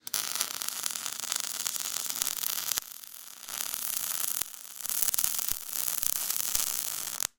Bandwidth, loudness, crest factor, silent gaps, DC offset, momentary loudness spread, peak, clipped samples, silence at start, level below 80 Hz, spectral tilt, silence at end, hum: 19 kHz; -29 LUFS; 32 dB; none; under 0.1%; 8 LU; 0 dBFS; under 0.1%; 0.05 s; -62 dBFS; 2 dB/octave; 0.1 s; none